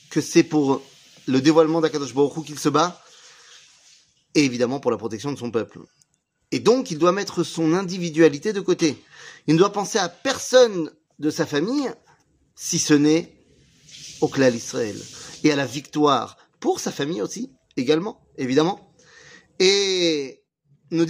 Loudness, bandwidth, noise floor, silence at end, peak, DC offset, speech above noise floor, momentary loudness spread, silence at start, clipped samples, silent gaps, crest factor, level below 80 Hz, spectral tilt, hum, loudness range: -21 LUFS; 15.5 kHz; -61 dBFS; 0 s; -2 dBFS; under 0.1%; 40 dB; 14 LU; 0.1 s; under 0.1%; none; 20 dB; -66 dBFS; -4.5 dB/octave; none; 4 LU